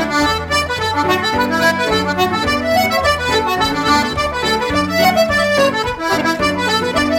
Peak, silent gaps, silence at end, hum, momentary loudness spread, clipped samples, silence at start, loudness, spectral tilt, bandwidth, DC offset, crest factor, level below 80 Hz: 0 dBFS; none; 0 s; none; 3 LU; under 0.1%; 0 s; -15 LUFS; -4 dB/octave; 16.5 kHz; under 0.1%; 14 dB; -38 dBFS